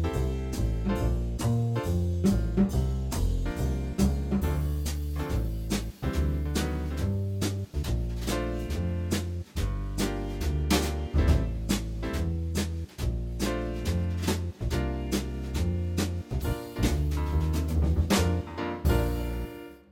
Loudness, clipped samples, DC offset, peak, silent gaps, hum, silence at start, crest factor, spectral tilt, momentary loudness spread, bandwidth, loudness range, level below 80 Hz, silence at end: -30 LUFS; under 0.1%; under 0.1%; -10 dBFS; none; none; 0 s; 16 dB; -6 dB/octave; 6 LU; 17 kHz; 3 LU; -32 dBFS; 0.1 s